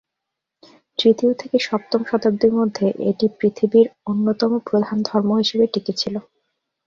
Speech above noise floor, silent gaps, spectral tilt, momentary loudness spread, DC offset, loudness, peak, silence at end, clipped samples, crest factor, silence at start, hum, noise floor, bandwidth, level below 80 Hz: 64 dB; none; -6 dB/octave; 6 LU; under 0.1%; -19 LUFS; -4 dBFS; 0.65 s; under 0.1%; 16 dB; 1 s; none; -82 dBFS; 7.4 kHz; -62 dBFS